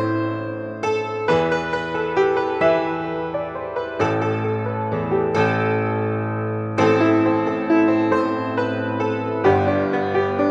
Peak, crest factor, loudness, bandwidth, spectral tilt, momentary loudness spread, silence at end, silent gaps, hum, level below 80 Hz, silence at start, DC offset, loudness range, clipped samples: -4 dBFS; 16 dB; -21 LUFS; 7.8 kHz; -7.5 dB/octave; 8 LU; 0 s; none; none; -54 dBFS; 0 s; under 0.1%; 3 LU; under 0.1%